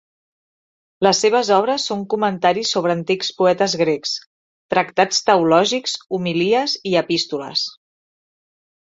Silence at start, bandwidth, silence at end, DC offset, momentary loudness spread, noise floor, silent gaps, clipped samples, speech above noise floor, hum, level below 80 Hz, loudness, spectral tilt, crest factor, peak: 1 s; 8.2 kHz; 1.2 s; under 0.1%; 7 LU; under -90 dBFS; 4.26-4.69 s; under 0.1%; over 72 dB; none; -64 dBFS; -18 LUFS; -3.5 dB/octave; 18 dB; -2 dBFS